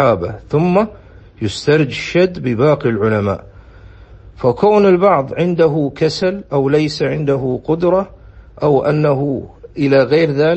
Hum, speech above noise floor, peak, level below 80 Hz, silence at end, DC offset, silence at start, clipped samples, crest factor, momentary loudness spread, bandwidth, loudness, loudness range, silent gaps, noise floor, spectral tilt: none; 25 dB; 0 dBFS; -42 dBFS; 0 s; under 0.1%; 0 s; under 0.1%; 14 dB; 8 LU; 8.6 kHz; -15 LUFS; 3 LU; none; -39 dBFS; -7 dB/octave